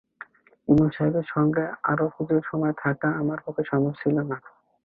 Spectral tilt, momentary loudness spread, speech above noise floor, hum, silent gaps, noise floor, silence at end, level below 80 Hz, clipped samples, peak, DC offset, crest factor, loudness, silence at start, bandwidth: -11 dB/octave; 11 LU; 24 dB; none; none; -48 dBFS; 0.45 s; -56 dBFS; under 0.1%; -6 dBFS; under 0.1%; 18 dB; -25 LUFS; 0.7 s; 4.4 kHz